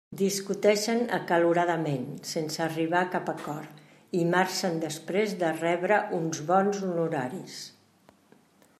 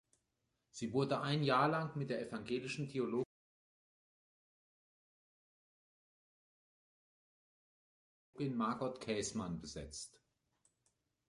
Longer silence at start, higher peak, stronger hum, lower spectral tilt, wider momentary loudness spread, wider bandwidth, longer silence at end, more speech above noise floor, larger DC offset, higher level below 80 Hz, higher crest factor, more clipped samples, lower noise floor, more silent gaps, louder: second, 0.1 s vs 0.75 s; first, -8 dBFS vs -20 dBFS; neither; about the same, -4.5 dB/octave vs -5.5 dB/octave; second, 11 LU vs 14 LU; first, 15 kHz vs 11.5 kHz; about the same, 1.1 s vs 1.2 s; second, 33 dB vs 47 dB; neither; second, -76 dBFS vs -70 dBFS; about the same, 20 dB vs 24 dB; neither; second, -61 dBFS vs -85 dBFS; second, none vs 3.25-8.33 s; first, -28 LUFS vs -39 LUFS